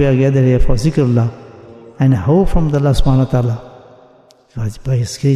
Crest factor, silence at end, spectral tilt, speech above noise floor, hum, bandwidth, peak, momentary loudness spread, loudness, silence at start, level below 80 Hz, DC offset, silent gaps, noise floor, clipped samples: 12 dB; 0 s; -8 dB/octave; 35 dB; none; 12.5 kHz; -2 dBFS; 11 LU; -15 LUFS; 0 s; -24 dBFS; under 0.1%; none; -47 dBFS; under 0.1%